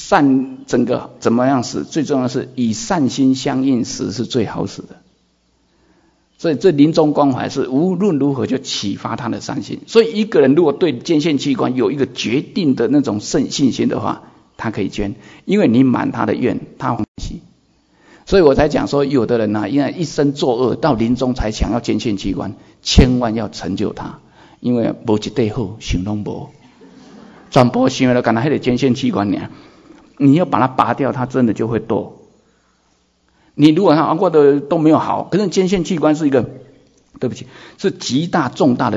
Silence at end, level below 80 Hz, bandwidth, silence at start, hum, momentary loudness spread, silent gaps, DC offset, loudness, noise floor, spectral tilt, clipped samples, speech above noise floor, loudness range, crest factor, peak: 0 s; -36 dBFS; 7.8 kHz; 0 s; none; 12 LU; 17.08-17.15 s; under 0.1%; -16 LUFS; -59 dBFS; -6 dB/octave; under 0.1%; 44 dB; 4 LU; 16 dB; 0 dBFS